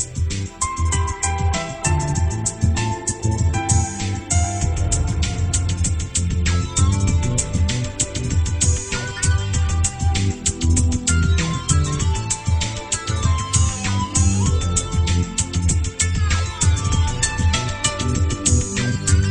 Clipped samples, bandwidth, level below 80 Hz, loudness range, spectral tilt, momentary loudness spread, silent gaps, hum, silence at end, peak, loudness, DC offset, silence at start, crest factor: under 0.1%; 10.5 kHz; -26 dBFS; 1 LU; -4 dB/octave; 4 LU; none; none; 0 s; -2 dBFS; -20 LUFS; under 0.1%; 0 s; 16 dB